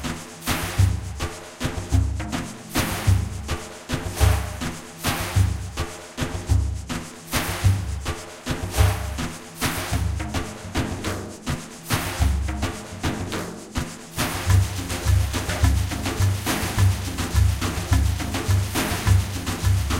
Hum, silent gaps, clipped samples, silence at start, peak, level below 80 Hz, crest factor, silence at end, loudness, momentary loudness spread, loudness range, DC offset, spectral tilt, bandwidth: none; none; under 0.1%; 0 s; -4 dBFS; -30 dBFS; 18 dB; 0 s; -25 LUFS; 9 LU; 4 LU; under 0.1%; -4.5 dB/octave; 16.5 kHz